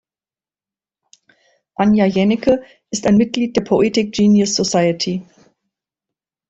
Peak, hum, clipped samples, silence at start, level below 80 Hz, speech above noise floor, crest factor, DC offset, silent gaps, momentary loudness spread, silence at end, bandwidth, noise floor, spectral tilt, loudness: -2 dBFS; none; under 0.1%; 1.8 s; -50 dBFS; over 75 dB; 16 dB; under 0.1%; none; 8 LU; 1.3 s; 8 kHz; under -90 dBFS; -5 dB/octave; -16 LUFS